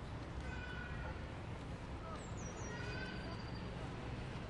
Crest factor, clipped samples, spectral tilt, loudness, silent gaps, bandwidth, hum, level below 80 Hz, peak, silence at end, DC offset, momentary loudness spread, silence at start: 12 dB; under 0.1%; -5.5 dB/octave; -47 LUFS; none; 11 kHz; none; -52 dBFS; -32 dBFS; 0 s; under 0.1%; 3 LU; 0 s